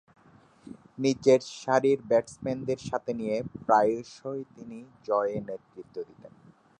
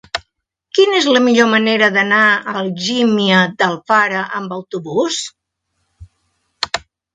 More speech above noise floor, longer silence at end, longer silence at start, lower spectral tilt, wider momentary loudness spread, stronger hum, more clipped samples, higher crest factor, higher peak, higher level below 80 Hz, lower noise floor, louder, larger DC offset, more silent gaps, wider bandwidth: second, 30 dB vs 56 dB; first, 0.5 s vs 0.35 s; first, 0.65 s vs 0.15 s; first, -5.5 dB/octave vs -4 dB/octave; first, 20 LU vs 13 LU; neither; neither; about the same, 20 dB vs 16 dB; second, -8 dBFS vs 0 dBFS; second, -66 dBFS vs -54 dBFS; second, -58 dBFS vs -70 dBFS; second, -28 LUFS vs -14 LUFS; neither; neither; about the same, 10 kHz vs 9.4 kHz